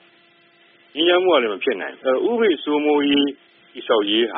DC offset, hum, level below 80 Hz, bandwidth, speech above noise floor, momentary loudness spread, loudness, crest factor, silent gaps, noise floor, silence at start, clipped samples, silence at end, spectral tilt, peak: under 0.1%; none; -66 dBFS; 4 kHz; 36 dB; 8 LU; -19 LUFS; 16 dB; none; -55 dBFS; 0.95 s; under 0.1%; 0 s; -0.5 dB/octave; -4 dBFS